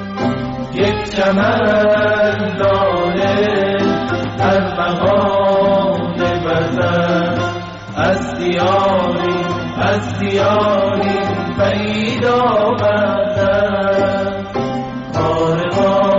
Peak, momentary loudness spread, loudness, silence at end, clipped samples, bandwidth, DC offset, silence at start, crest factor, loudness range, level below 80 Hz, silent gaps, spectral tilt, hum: -4 dBFS; 6 LU; -15 LUFS; 0 s; under 0.1%; 7.8 kHz; under 0.1%; 0 s; 10 dB; 2 LU; -40 dBFS; none; -4.5 dB/octave; none